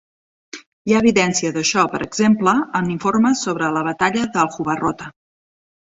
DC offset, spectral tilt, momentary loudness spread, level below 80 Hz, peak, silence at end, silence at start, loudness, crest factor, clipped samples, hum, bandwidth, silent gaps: under 0.1%; -4.5 dB/octave; 15 LU; -54 dBFS; -2 dBFS; 0.85 s; 0.55 s; -18 LUFS; 18 dB; under 0.1%; none; 8 kHz; 0.67-0.85 s